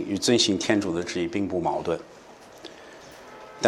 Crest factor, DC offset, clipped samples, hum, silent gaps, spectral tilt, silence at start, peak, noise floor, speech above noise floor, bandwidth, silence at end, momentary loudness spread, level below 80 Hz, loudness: 24 dB; under 0.1%; under 0.1%; none; none; -3.5 dB/octave; 0 s; -4 dBFS; -45 dBFS; 21 dB; 13 kHz; 0 s; 24 LU; -60 dBFS; -25 LUFS